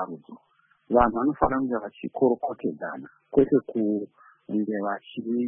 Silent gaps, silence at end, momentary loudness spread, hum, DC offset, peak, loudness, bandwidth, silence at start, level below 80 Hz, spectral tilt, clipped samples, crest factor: none; 0 s; 14 LU; none; under 0.1%; -6 dBFS; -26 LUFS; 3.6 kHz; 0 s; -48 dBFS; -11.5 dB/octave; under 0.1%; 20 dB